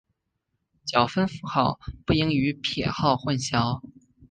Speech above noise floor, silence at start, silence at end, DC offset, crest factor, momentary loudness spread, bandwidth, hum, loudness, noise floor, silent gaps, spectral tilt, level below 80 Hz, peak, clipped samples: 54 dB; 0.85 s; 0.05 s; under 0.1%; 22 dB; 6 LU; 10 kHz; none; -25 LUFS; -78 dBFS; none; -5.5 dB/octave; -48 dBFS; -4 dBFS; under 0.1%